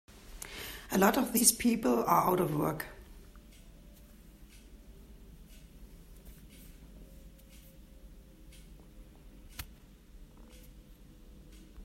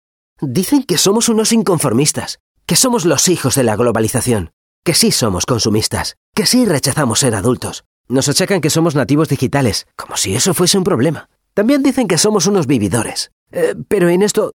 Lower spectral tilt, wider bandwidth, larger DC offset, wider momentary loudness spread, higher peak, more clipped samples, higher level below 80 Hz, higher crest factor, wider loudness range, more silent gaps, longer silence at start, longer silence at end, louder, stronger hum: about the same, -3.5 dB/octave vs -4 dB/octave; second, 16 kHz vs 19.5 kHz; neither; first, 30 LU vs 9 LU; second, -8 dBFS vs 0 dBFS; neither; second, -54 dBFS vs -46 dBFS; first, 28 dB vs 14 dB; first, 26 LU vs 2 LU; second, none vs 2.40-2.55 s, 4.53-4.83 s, 6.17-6.32 s, 7.86-8.04 s, 13.32-13.46 s; second, 0.15 s vs 0.4 s; about the same, 0 s vs 0.05 s; second, -29 LUFS vs -14 LUFS; neither